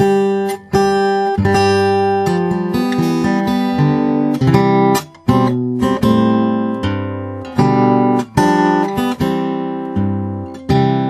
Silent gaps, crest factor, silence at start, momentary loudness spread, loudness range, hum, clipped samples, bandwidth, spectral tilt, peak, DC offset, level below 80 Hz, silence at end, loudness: none; 14 dB; 0 s; 7 LU; 1 LU; none; under 0.1%; 14 kHz; -7 dB/octave; 0 dBFS; under 0.1%; -42 dBFS; 0 s; -15 LUFS